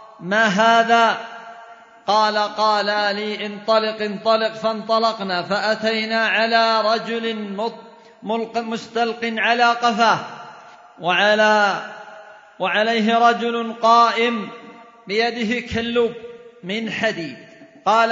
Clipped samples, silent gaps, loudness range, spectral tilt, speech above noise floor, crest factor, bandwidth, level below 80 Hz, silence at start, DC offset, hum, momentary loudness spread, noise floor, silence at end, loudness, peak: under 0.1%; none; 3 LU; -4 dB/octave; 24 dB; 18 dB; 7.8 kHz; -60 dBFS; 0 s; under 0.1%; none; 15 LU; -43 dBFS; 0 s; -19 LUFS; -2 dBFS